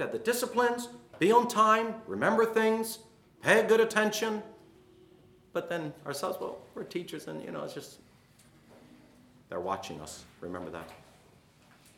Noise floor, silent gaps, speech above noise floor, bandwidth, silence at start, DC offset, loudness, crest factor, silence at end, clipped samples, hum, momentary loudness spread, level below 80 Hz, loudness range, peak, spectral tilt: -60 dBFS; none; 31 dB; 18 kHz; 0 s; under 0.1%; -29 LUFS; 24 dB; 1 s; under 0.1%; none; 19 LU; -72 dBFS; 15 LU; -8 dBFS; -4 dB/octave